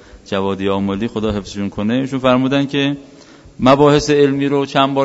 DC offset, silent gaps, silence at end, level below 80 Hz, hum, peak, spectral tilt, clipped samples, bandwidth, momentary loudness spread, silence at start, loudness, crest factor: under 0.1%; none; 0 s; -42 dBFS; none; 0 dBFS; -6 dB/octave; under 0.1%; 8 kHz; 10 LU; 0.15 s; -16 LUFS; 16 dB